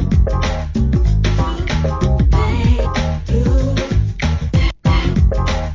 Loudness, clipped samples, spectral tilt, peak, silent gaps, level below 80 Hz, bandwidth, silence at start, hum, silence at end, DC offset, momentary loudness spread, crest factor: -17 LUFS; under 0.1%; -7 dB/octave; -2 dBFS; none; -18 dBFS; 7.6 kHz; 0 s; none; 0 s; 0.1%; 4 LU; 12 dB